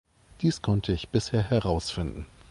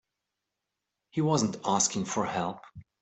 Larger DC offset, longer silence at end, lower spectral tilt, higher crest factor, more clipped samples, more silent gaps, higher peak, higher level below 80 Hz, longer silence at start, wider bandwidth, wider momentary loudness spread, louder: neither; about the same, 0.25 s vs 0.2 s; first, -6.5 dB/octave vs -4 dB/octave; about the same, 18 dB vs 20 dB; neither; neither; about the same, -10 dBFS vs -12 dBFS; first, -42 dBFS vs -66 dBFS; second, 0.4 s vs 1.15 s; first, 11.5 kHz vs 8.4 kHz; about the same, 8 LU vs 10 LU; about the same, -28 LUFS vs -29 LUFS